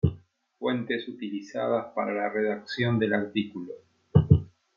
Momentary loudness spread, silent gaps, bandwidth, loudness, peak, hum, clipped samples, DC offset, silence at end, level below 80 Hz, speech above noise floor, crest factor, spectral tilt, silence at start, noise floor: 12 LU; none; 7.2 kHz; -28 LUFS; -4 dBFS; none; under 0.1%; under 0.1%; 0.3 s; -48 dBFS; 23 dB; 22 dB; -8.5 dB/octave; 0.05 s; -52 dBFS